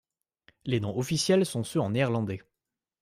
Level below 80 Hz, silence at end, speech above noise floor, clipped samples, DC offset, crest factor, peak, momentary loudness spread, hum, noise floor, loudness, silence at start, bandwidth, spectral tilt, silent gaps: -62 dBFS; 0.6 s; 61 dB; under 0.1%; under 0.1%; 18 dB; -12 dBFS; 11 LU; none; -88 dBFS; -28 LUFS; 0.65 s; 15.5 kHz; -5.5 dB/octave; none